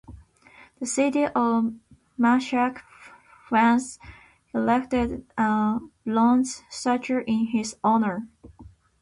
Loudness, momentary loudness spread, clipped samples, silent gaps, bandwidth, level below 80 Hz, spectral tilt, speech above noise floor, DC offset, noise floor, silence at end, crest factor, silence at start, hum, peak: -24 LUFS; 12 LU; under 0.1%; none; 11.5 kHz; -52 dBFS; -5 dB/octave; 30 dB; under 0.1%; -53 dBFS; 0.35 s; 16 dB; 0.1 s; none; -10 dBFS